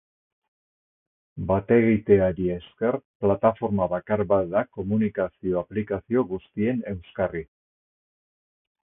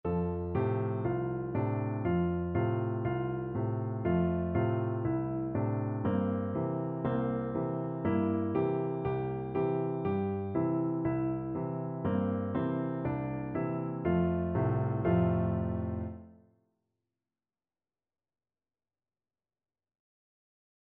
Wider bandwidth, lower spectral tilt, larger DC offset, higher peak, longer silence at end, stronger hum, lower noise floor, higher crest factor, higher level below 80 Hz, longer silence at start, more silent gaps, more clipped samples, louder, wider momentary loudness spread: about the same, 3.7 kHz vs 3.8 kHz; first, -12.5 dB/octave vs -9.5 dB/octave; neither; first, -4 dBFS vs -16 dBFS; second, 1.4 s vs 4.65 s; neither; about the same, under -90 dBFS vs under -90 dBFS; about the same, 20 dB vs 16 dB; about the same, -50 dBFS vs -54 dBFS; first, 1.35 s vs 0.05 s; first, 3.05-3.20 s vs none; neither; first, -25 LUFS vs -32 LUFS; first, 9 LU vs 5 LU